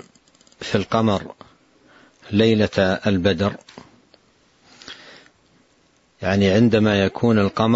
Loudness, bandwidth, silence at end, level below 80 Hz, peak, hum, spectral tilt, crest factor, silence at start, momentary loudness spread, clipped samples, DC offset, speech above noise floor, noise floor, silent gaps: -19 LUFS; 8 kHz; 0 s; -52 dBFS; -4 dBFS; none; -6.5 dB/octave; 18 dB; 0.6 s; 23 LU; under 0.1%; under 0.1%; 42 dB; -60 dBFS; none